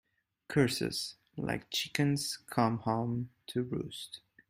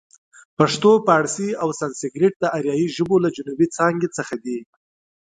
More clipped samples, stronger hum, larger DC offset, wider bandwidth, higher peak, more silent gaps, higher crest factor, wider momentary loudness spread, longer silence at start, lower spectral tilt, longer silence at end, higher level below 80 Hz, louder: neither; neither; neither; first, 16 kHz vs 9.4 kHz; second, -12 dBFS vs 0 dBFS; second, none vs 2.36-2.40 s; about the same, 22 dB vs 20 dB; about the same, 10 LU vs 12 LU; about the same, 0.5 s vs 0.6 s; about the same, -5 dB/octave vs -5 dB/octave; second, 0.3 s vs 0.6 s; about the same, -64 dBFS vs -64 dBFS; second, -34 LUFS vs -20 LUFS